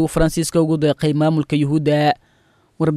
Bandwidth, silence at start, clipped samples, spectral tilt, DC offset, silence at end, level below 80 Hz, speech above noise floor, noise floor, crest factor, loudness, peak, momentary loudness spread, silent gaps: 14.5 kHz; 0 s; under 0.1%; -6.5 dB/octave; under 0.1%; 0 s; -36 dBFS; 41 dB; -57 dBFS; 14 dB; -18 LUFS; -4 dBFS; 3 LU; none